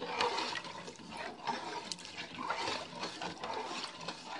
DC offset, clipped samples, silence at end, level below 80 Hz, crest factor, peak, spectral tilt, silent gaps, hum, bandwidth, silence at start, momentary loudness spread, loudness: under 0.1%; under 0.1%; 0 s; -76 dBFS; 24 dB; -16 dBFS; -2.5 dB/octave; none; none; 11.5 kHz; 0 s; 10 LU; -39 LUFS